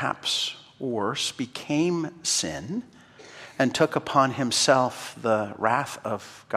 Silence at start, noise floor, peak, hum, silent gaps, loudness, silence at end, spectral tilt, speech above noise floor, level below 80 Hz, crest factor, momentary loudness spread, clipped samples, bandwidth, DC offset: 0 s; -46 dBFS; -6 dBFS; none; none; -25 LUFS; 0 s; -3.5 dB/octave; 21 dB; -66 dBFS; 20 dB; 12 LU; under 0.1%; 16 kHz; under 0.1%